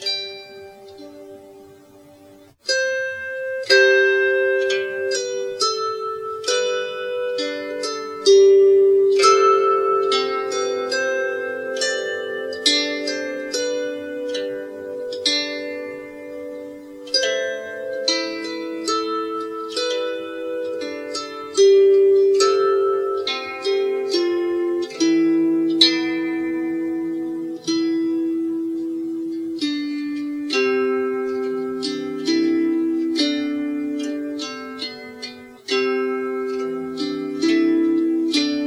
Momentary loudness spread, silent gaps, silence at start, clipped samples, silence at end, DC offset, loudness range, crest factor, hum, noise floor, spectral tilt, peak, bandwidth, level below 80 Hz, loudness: 14 LU; none; 0 s; under 0.1%; 0 s; under 0.1%; 9 LU; 20 dB; none; -47 dBFS; -2 dB/octave; 0 dBFS; 11.5 kHz; -68 dBFS; -20 LUFS